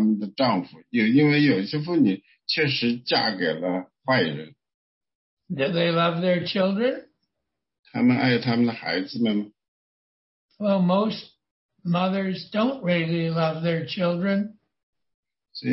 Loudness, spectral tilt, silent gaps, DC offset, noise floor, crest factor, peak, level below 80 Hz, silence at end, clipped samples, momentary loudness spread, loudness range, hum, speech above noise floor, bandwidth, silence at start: -23 LUFS; -10 dB/octave; 4.74-5.01 s, 5.15-5.37 s, 7.79-7.83 s, 9.68-10.49 s, 11.51-11.69 s, 14.83-14.93 s, 15.14-15.23 s; under 0.1%; -83 dBFS; 16 dB; -8 dBFS; -68 dBFS; 0 s; under 0.1%; 9 LU; 4 LU; none; 60 dB; 5.8 kHz; 0 s